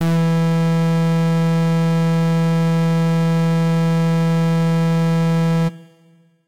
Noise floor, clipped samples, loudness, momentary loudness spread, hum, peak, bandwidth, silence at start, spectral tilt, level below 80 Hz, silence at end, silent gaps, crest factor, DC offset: -53 dBFS; under 0.1%; -17 LUFS; 0 LU; none; -12 dBFS; 11 kHz; 0 s; -8 dB/octave; -56 dBFS; 0 s; none; 4 dB; 1%